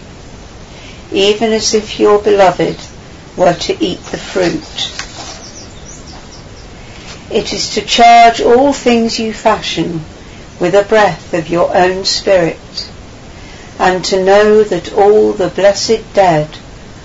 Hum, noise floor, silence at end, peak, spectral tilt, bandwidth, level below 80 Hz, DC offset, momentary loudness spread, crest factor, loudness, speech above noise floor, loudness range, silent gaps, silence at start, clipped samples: none; -32 dBFS; 0 s; 0 dBFS; -4 dB/octave; 8 kHz; -38 dBFS; 0.2%; 23 LU; 12 dB; -11 LUFS; 21 dB; 9 LU; none; 0 s; under 0.1%